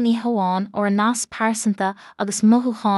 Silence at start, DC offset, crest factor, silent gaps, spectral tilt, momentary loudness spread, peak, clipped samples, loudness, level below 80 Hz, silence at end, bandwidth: 0 s; under 0.1%; 14 dB; none; -5 dB/octave; 8 LU; -6 dBFS; under 0.1%; -20 LUFS; -68 dBFS; 0 s; 12 kHz